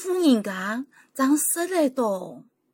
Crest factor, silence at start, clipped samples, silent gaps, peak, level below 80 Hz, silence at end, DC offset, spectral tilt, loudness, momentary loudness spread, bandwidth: 16 dB; 0 s; under 0.1%; none; -8 dBFS; -74 dBFS; 0.35 s; under 0.1%; -3.5 dB/octave; -23 LUFS; 12 LU; 17 kHz